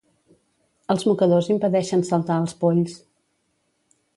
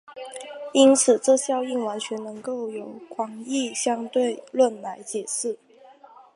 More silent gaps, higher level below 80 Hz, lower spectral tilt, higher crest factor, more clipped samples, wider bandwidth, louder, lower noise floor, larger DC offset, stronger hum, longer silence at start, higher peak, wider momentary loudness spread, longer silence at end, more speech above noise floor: neither; first, -66 dBFS vs -82 dBFS; first, -7 dB/octave vs -2.5 dB/octave; about the same, 18 dB vs 20 dB; neither; about the same, 11.5 kHz vs 11.5 kHz; about the same, -21 LUFS vs -23 LUFS; first, -70 dBFS vs -50 dBFS; neither; neither; first, 0.9 s vs 0.1 s; about the same, -6 dBFS vs -4 dBFS; second, 7 LU vs 19 LU; first, 1.2 s vs 0.8 s; first, 50 dB vs 27 dB